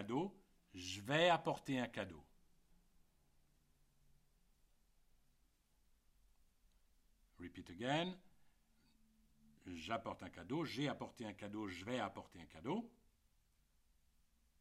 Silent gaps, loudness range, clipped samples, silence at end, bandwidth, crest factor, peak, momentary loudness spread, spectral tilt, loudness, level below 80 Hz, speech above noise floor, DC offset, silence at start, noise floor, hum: none; 9 LU; under 0.1%; 1.7 s; 15.5 kHz; 24 dB; -22 dBFS; 20 LU; -5 dB/octave; -43 LUFS; -74 dBFS; 34 dB; under 0.1%; 0 s; -77 dBFS; none